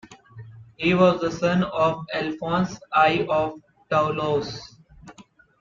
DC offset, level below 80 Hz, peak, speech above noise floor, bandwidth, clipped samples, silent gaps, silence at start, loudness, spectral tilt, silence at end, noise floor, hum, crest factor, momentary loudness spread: under 0.1%; -56 dBFS; -6 dBFS; 29 dB; 7.4 kHz; under 0.1%; none; 0.1 s; -23 LUFS; -6.5 dB/octave; 0.4 s; -51 dBFS; none; 18 dB; 9 LU